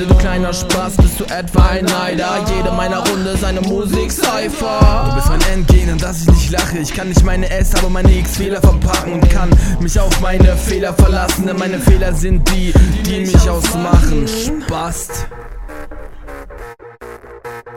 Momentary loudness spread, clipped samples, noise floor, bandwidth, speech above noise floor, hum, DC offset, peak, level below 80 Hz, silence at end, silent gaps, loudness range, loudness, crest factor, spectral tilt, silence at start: 19 LU; under 0.1%; -33 dBFS; 17 kHz; 22 dB; none; under 0.1%; 0 dBFS; -16 dBFS; 0 s; none; 3 LU; -14 LUFS; 12 dB; -5.5 dB/octave; 0 s